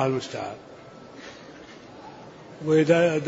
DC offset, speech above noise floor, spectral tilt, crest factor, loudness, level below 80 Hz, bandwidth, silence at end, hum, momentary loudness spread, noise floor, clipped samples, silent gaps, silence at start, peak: under 0.1%; 22 dB; -6.5 dB/octave; 20 dB; -24 LUFS; -66 dBFS; 8 kHz; 0 s; none; 25 LU; -45 dBFS; under 0.1%; none; 0 s; -6 dBFS